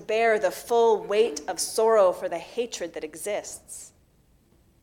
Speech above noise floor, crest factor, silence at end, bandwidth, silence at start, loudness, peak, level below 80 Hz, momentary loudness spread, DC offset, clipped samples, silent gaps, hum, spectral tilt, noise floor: 37 dB; 16 dB; 0.95 s; 17 kHz; 0 s; -25 LUFS; -10 dBFS; -64 dBFS; 15 LU; under 0.1%; under 0.1%; none; none; -2 dB/octave; -61 dBFS